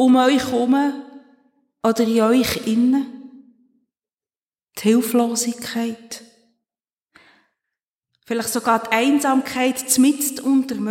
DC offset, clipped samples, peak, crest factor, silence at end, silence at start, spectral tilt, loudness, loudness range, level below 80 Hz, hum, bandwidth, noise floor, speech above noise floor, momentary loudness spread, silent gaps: under 0.1%; under 0.1%; -4 dBFS; 18 dB; 0 s; 0 s; -3.5 dB/octave; -19 LUFS; 7 LU; -58 dBFS; none; 17 kHz; under -90 dBFS; over 72 dB; 11 LU; 4.38-4.42 s, 7.02-7.06 s, 7.84-7.92 s, 7.98-8.02 s